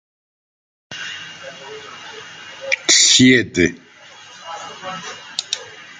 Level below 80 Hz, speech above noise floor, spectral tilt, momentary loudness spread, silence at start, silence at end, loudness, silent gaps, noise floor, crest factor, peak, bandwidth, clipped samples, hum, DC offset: -58 dBFS; 25 dB; -2 dB/octave; 24 LU; 0.9 s; 0.2 s; -14 LUFS; none; -42 dBFS; 20 dB; 0 dBFS; 9.6 kHz; under 0.1%; none; under 0.1%